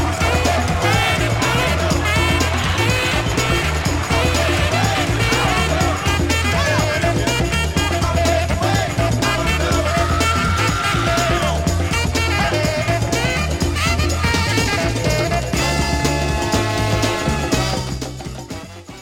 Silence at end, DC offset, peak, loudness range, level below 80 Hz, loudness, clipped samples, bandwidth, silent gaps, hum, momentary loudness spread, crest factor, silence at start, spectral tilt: 0 s; under 0.1%; -2 dBFS; 1 LU; -26 dBFS; -17 LUFS; under 0.1%; 16.5 kHz; none; none; 3 LU; 16 dB; 0 s; -4.5 dB/octave